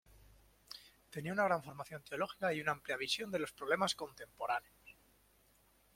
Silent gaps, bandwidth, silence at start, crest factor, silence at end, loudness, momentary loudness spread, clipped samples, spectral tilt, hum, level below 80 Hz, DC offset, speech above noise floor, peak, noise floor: none; 16.5 kHz; 0.15 s; 22 dB; 1.05 s; -38 LUFS; 18 LU; under 0.1%; -3.5 dB/octave; none; -72 dBFS; under 0.1%; 32 dB; -18 dBFS; -71 dBFS